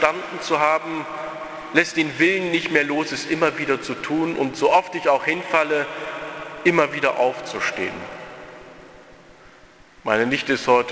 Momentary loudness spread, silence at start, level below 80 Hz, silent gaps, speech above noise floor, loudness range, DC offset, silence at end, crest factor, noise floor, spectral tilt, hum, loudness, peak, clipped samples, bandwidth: 14 LU; 0 s; -60 dBFS; none; 28 dB; 6 LU; under 0.1%; 0 s; 22 dB; -49 dBFS; -4.5 dB/octave; none; -21 LUFS; 0 dBFS; under 0.1%; 8 kHz